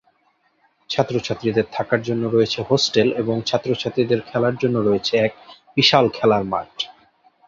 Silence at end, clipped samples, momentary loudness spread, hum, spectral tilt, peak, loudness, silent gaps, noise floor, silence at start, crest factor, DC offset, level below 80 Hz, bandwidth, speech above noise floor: 0.55 s; under 0.1%; 9 LU; none; -5 dB/octave; -2 dBFS; -20 LUFS; none; -63 dBFS; 0.9 s; 18 dB; under 0.1%; -56 dBFS; 7.6 kHz; 44 dB